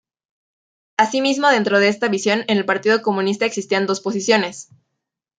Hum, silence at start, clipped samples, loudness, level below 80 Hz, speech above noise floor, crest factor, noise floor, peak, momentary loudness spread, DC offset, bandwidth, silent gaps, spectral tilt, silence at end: none; 1 s; under 0.1%; -18 LUFS; -68 dBFS; 61 dB; 18 dB; -79 dBFS; -2 dBFS; 6 LU; under 0.1%; 9.4 kHz; none; -4 dB/octave; 0.75 s